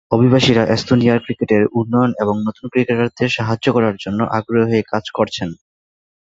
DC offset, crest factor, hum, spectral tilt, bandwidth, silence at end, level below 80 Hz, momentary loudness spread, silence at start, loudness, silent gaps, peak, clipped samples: under 0.1%; 16 dB; none; -6.5 dB/octave; 7.8 kHz; 0.75 s; -48 dBFS; 7 LU; 0.1 s; -16 LUFS; none; 0 dBFS; under 0.1%